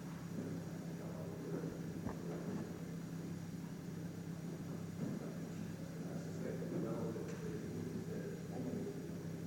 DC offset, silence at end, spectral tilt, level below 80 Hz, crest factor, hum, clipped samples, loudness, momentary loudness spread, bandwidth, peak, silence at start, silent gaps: under 0.1%; 0 s; -7 dB/octave; -68 dBFS; 14 dB; none; under 0.1%; -45 LUFS; 4 LU; 17 kHz; -30 dBFS; 0 s; none